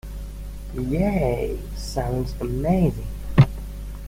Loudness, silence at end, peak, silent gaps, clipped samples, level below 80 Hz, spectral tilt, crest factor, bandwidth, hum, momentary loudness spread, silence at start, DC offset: -23 LUFS; 0 s; -2 dBFS; none; under 0.1%; -32 dBFS; -8 dB/octave; 20 dB; 16.5 kHz; 50 Hz at -30 dBFS; 17 LU; 0.05 s; under 0.1%